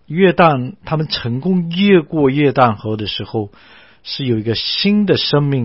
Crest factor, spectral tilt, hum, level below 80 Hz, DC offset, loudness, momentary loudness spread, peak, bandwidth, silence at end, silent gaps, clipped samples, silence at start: 16 dB; -9.5 dB/octave; none; -48 dBFS; 0.3%; -15 LUFS; 10 LU; 0 dBFS; 5.8 kHz; 0 s; none; under 0.1%; 0.1 s